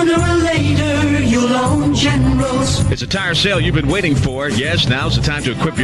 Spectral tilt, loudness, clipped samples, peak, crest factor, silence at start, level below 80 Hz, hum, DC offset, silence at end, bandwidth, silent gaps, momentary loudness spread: -5 dB/octave; -15 LUFS; under 0.1%; -4 dBFS; 12 dB; 0 s; -28 dBFS; none; under 0.1%; 0 s; 11.5 kHz; none; 4 LU